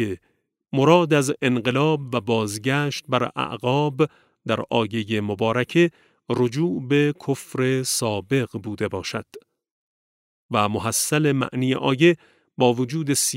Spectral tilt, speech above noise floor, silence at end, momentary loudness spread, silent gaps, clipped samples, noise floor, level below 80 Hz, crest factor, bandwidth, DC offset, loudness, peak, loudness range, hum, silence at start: -5 dB/octave; over 68 dB; 0 s; 10 LU; 9.71-10.49 s; under 0.1%; under -90 dBFS; -64 dBFS; 20 dB; 16 kHz; under 0.1%; -22 LUFS; -2 dBFS; 5 LU; none; 0 s